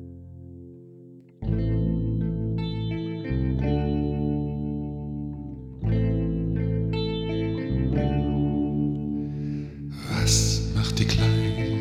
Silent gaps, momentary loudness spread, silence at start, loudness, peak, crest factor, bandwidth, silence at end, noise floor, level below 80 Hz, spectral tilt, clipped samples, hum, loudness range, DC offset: none; 14 LU; 0 s; -26 LUFS; -6 dBFS; 18 dB; 14 kHz; 0 s; -48 dBFS; -34 dBFS; -5.5 dB/octave; under 0.1%; none; 4 LU; under 0.1%